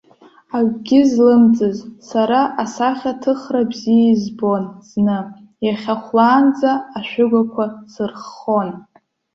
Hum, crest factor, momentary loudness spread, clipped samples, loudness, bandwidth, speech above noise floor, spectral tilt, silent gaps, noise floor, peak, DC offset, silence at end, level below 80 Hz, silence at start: none; 14 dB; 14 LU; under 0.1%; -17 LUFS; 7.4 kHz; 32 dB; -6.5 dB/octave; none; -48 dBFS; -2 dBFS; under 0.1%; 0.55 s; -60 dBFS; 0.55 s